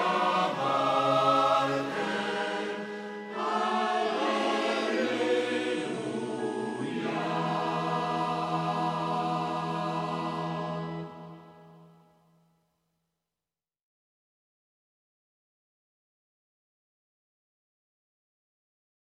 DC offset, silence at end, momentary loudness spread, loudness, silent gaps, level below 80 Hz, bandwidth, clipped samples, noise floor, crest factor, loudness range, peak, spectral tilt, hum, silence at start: under 0.1%; 7.2 s; 9 LU; -29 LUFS; none; -74 dBFS; 13 kHz; under 0.1%; under -90 dBFS; 20 dB; 9 LU; -12 dBFS; -5.5 dB/octave; none; 0 s